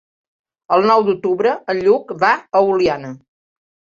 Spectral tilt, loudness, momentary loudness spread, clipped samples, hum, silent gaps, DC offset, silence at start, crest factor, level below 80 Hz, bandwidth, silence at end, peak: -6 dB/octave; -16 LUFS; 5 LU; under 0.1%; none; none; under 0.1%; 0.7 s; 16 dB; -58 dBFS; 7.4 kHz; 0.8 s; -2 dBFS